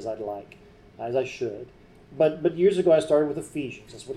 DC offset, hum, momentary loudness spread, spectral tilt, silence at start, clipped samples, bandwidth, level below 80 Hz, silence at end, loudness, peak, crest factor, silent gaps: under 0.1%; none; 17 LU; -6.5 dB/octave; 0 s; under 0.1%; 12 kHz; -60 dBFS; 0 s; -25 LUFS; -8 dBFS; 16 dB; none